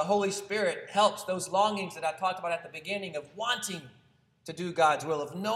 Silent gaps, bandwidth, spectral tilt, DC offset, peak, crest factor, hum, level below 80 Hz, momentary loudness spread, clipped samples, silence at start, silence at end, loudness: none; 15.5 kHz; -3.5 dB/octave; under 0.1%; -10 dBFS; 20 dB; none; -76 dBFS; 11 LU; under 0.1%; 0 s; 0 s; -30 LUFS